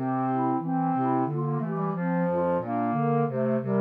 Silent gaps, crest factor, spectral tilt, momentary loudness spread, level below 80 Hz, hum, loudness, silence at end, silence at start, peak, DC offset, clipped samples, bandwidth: none; 12 dB; -12 dB/octave; 3 LU; -70 dBFS; 50 Hz at -55 dBFS; -27 LUFS; 0 s; 0 s; -14 dBFS; under 0.1%; under 0.1%; 3.8 kHz